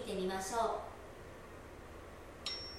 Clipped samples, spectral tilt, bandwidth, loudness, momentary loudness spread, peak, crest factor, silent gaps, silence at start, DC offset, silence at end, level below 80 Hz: under 0.1%; -3.5 dB/octave; 16.5 kHz; -40 LUFS; 16 LU; -24 dBFS; 18 dB; none; 0 s; under 0.1%; 0 s; -58 dBFS